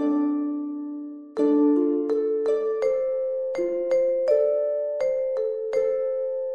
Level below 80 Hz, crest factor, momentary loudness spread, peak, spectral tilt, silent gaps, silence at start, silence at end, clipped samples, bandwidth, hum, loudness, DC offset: -68 dBFS; 14 dB; 8 LU; -10 dBFS; -6.5 dB/octave; none; 0 s; 0 s; under 0.1%; 7 kHz; none; -24 LUFS; under 0.1%